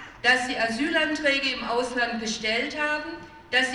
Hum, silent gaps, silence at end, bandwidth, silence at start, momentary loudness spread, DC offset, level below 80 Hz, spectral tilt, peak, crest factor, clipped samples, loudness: none; none; 0 s; 12.5 kHz; 0 s; 6 LU; under 0.1%; -56 dBFS; -2 dB/octave; -8 dBFS; 18 dB; under 0.1%; -24 LUFS